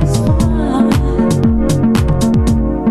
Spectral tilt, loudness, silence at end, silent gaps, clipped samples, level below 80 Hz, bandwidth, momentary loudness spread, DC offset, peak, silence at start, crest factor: -7 dB/octave; -13 LUFS; 0 s; none; under 0.1%; -20 dBFS; 14 kHz; 1 LU; under 0.1%; 0 dBFS; 0 s; 12 dB